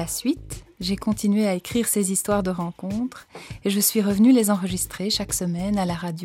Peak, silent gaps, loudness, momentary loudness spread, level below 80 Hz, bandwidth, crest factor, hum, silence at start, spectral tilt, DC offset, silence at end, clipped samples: -6 dBFS; none; -23 LUFS; 12 LU; -46 dBFS; 16.5 kHz; 16 dB; none; 0 s; -4.5 dB/octave; under 0.1%; 0 s; under 0.1%